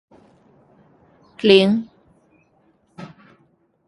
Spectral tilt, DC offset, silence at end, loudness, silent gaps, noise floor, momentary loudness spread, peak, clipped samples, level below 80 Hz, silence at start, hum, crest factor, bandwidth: -6.5 dB/octave; under 0.1%; 0.8 s; -16 LUFS; none; -61 dBFS; 27 LU; 0 dBFS; under 0.1%; -64 dBFS; 1.45 s; none; 22 dB; 11.5 kHz